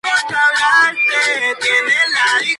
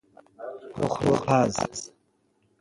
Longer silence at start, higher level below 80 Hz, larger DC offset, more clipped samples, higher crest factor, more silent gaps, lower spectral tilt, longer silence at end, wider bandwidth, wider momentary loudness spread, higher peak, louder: second, 0.05 s vs 0.4 s; second, -62 dBFS vs -54 dBFS; neither; neither; second, 12 dB vs 22 dB; neither; second, 0.5 dB/octave vs -5.5 dB/octave; second, 0 s vs 0.75 s; about the same, 11.5 kHz vs 11.5 kHz; second, 4 LU vs 19 LU; first, -2 dBFS vs -6 dBFS; first, -13 LUFS vs -25 LUFS